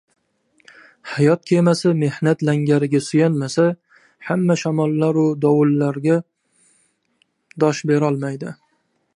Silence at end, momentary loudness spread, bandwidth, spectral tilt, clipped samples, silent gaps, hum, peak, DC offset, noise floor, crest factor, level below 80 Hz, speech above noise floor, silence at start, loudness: 0.65 s; 10 LU; 11 kHz; -7 dB/octave; under 0.1%; none; none; -2 dBFS; under 0.1%; -66 dBFS; 16 dB; -66 dBFS; 49 dB; 1.05 s; -18 LUFS